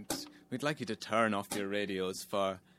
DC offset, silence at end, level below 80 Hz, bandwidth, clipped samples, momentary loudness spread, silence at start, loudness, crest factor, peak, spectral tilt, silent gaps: under 0.1%; 0.2 s; -74 dBFS; 16 kHz; under 0.1%; 9 LU; 0 s; -35 LUFS; 22 dB; -14 dBFS; -4 dB/octave; none